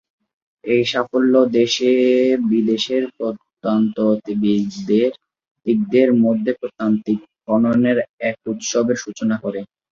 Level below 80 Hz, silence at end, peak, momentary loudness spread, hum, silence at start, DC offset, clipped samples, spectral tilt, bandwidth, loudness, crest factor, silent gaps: -62 dBFS; 0.25 s; -2 dBFS; 10 LU; none; 0.65 s; under 0.1%; under 0.1%; -5.5 dB/octave; 7.4 kHz; -18 LUFS; 16 dB; 5.51-5.55 s, 8.09-8.18 s